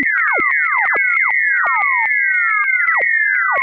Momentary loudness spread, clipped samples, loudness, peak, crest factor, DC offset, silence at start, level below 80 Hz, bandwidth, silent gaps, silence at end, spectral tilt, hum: 1 LU; under 0.1%; -13 LUFS; -4 dBFS; 10 dB; under 0.1%; 0 s; -64 dBFS; 4.6 kHz; none; 0 s; -5.5 dB/octave; none